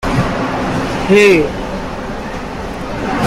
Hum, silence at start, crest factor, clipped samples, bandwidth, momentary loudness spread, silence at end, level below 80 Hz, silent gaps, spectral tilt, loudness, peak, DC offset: none; 0 s; 14 dB; under 0.1%; 15.5 kHz; 15 LU; 0 s; -30 dBFS; none; -5.5 dB/octave; -15 LUFS; 0 dBFS; under 0.1%